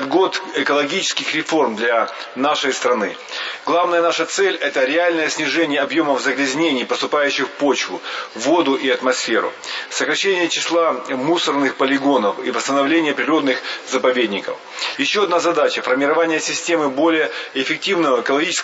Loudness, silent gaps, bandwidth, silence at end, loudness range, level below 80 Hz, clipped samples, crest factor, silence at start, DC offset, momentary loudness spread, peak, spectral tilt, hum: -18 LUFS; none; 8 kHz; 0 s; 1 LU; -76 dBFS; under 0.1%; 16 dB; 0 s; under 0.1%; 6 LU; -2 dBFS; -2.5 dB/octave; none